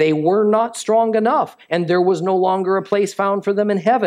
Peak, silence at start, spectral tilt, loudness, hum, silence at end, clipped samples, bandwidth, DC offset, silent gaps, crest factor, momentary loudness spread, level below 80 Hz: -4 dBFS; 0 s; -6 dB/octave; -17 LUFS; none; 0 s; under 0.1%; 13 kHz; under 0.1%; none; 14 dB; 4 LU; -72 dBFS